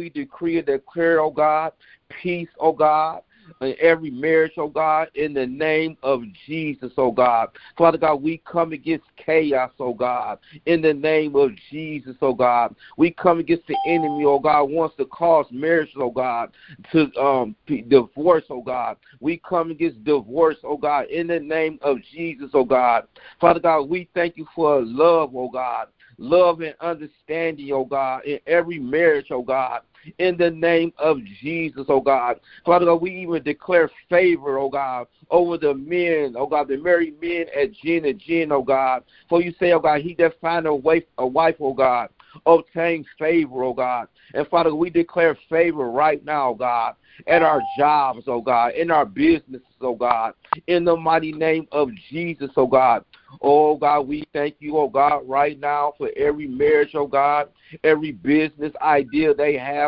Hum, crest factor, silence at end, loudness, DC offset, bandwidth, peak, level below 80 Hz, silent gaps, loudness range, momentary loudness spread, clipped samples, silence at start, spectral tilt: none; 20 dB; 0 s; -20 LUFS; under 0.1%; 5.4 kHz; 0 dBFS; -58 dBFS; none; 2 LU; 10 LU; under 0.1%; 0 s; -10.5 dB/octave